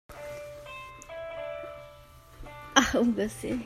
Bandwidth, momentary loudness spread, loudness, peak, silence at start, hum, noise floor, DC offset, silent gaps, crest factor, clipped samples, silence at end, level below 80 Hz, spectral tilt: 16 kHz; 23 LU; -28 LUFS; -4 dBFS; 0.1 s; none; -52 dBFS; under 0.1%; none; 28 dB; under 0.1%; 0 s; -52 dBFS; -3 dB/octave